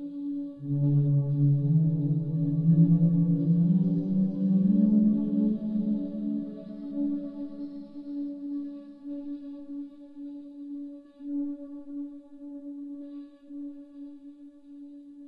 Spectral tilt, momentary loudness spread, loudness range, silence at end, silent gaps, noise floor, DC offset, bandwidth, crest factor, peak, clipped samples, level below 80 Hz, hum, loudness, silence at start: -13.5 dB/octave; 21 LU; 15 LU; 0 s; none; -48 dBFS; under 0.1%; 1.8 kHz; 16 dB; -12 dBFS; under 0.1%; -62 dBFS; none; -27 LUFS; 0 s